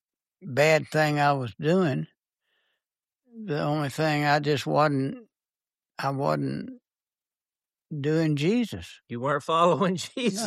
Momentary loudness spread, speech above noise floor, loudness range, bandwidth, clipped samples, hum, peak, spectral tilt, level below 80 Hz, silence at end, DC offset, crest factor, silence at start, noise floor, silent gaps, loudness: 15 LU; over 65 dB; 4 LU; 13.5 kHz; under 0.1%; none; -8 dBFS; -6 dB/octave; -66 dBFS; 0 s; under 0.1%; 18 dB; 0.4 s; under -90 dBFS; none; -25 LUFS